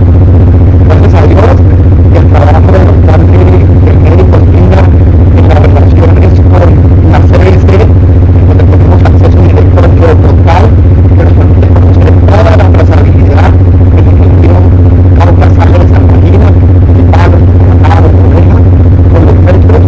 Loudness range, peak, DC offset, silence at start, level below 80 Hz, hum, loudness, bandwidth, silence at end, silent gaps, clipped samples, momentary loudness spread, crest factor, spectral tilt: 0 LU; 0 dBFS; 6%; 0 s; -6 dBFS; none; -3 LUFS; 5.6 kHz; 0 s; none; 50%; 1 LU; 2 dB; -10 dB/octave